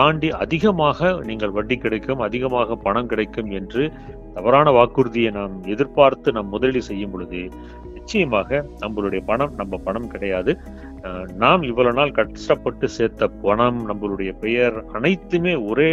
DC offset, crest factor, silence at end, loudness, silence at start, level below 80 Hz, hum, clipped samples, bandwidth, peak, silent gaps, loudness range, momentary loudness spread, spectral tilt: under 0.1%; 20 dB; 0 s; -20 LUFS; 0 s; -40 dBFS; none; under 0.1%; 7.8 kHz; 0 dBFS; none; 5 LU; 12 LU; -6.5 dB/octave